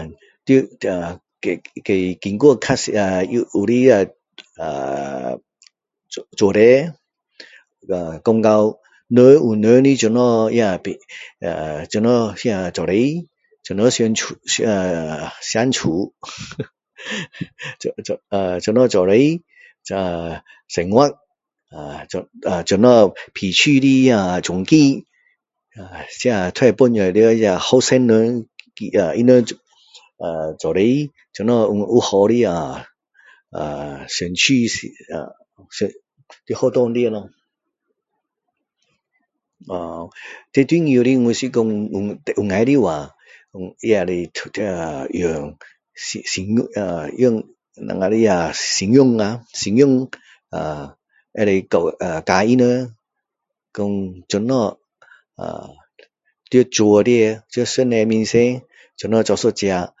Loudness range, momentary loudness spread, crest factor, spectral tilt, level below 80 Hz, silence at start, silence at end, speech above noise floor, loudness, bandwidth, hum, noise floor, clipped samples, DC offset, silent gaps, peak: 8 LU; 17 LU; 18 dB; -5 dB/octave; -50 dBFS; 0 s; 0.15 s; 65 dB; -17 LUFS; 8 kHz; none; -82 dBFS; under 0.1%; under 0.1%; none; 0 dBFS